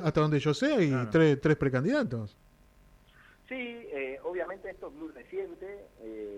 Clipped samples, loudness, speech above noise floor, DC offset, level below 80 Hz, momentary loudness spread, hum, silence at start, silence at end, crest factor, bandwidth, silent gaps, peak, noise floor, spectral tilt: under 0.1%; -29 LUFS; 30 dB; under 0.1%; -58 dBFS; 20 LU; none; 0 s; 0 s; 20 dB; 10 kHz; none; -12 dBFS; -59 dBFS; -7 dB/octave